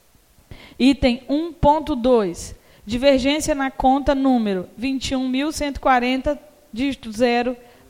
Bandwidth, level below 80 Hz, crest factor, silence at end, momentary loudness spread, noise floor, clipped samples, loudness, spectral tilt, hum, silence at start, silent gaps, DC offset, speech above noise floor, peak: 16 kHz; -38 dBFS; 18 dB; 0.3 s; 9 LU; -55 dBFS; under 0.1%; -20 LUFS; -4.5 dB/octave; none; 0.5 s; none; under 0.1%; 36 dB; -2 dBFS